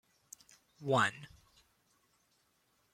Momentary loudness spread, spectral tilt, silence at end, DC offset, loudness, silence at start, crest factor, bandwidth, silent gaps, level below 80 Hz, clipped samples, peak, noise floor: 25 LU; -4.5 dB/octave; 1.7 s; under 0.1%; -33 LUFS; 0.8 s; 24 dB; 16 kHz; none; -76 dBFS; under 0.1%; -16 dBFS; -75 dBFS